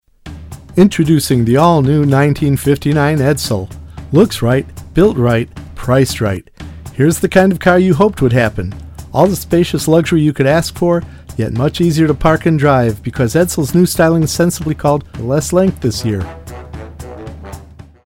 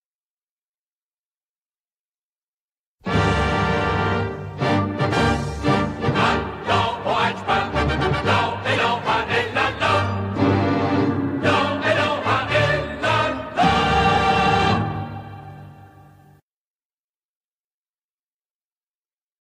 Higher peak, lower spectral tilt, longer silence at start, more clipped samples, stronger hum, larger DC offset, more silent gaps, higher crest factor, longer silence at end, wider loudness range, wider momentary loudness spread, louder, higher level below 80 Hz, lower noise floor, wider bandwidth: first, 0 dBFS vs -6 dBFS; about the same, -6.5 dB/octave vs -6 dB/octave; second, 0.25 s vs 3.05 s; neither; neither; neither; neither; about the same, 14 dB vs 16 dB; second, 0.4 s vs 3.55 s; second, 2 LU vs 6 LU; first, 19 LU vs 7 LU; first, -13 LUFS vs -20 LUFS; first, -34 dBFS vs -40 dBFS; second, -36 dBFS vs under -90 dBFS; first, 17 kHz vs 11.5 kHz